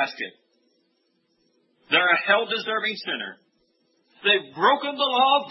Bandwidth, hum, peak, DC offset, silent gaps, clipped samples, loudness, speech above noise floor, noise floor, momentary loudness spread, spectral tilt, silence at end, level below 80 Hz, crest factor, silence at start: 6 kHz; none; -4 dBFS; under 0.1%; none; under 0.1%; -22 LUFS; 47 dB; -70 dBFS; 12 LU; -4.5 dB/octave; 0 s; -88 dBFS; 20 dB; 0 s